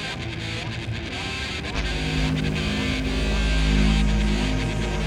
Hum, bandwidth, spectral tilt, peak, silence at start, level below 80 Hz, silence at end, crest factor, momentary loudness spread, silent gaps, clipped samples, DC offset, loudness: none; 11 kHz; -5 dB/octave; -8 dBFS; 0 s; -26 dBFS; 0 s; 14 dB; 8 LU; none; under 0.1%; under 0.1%; -25 LUFS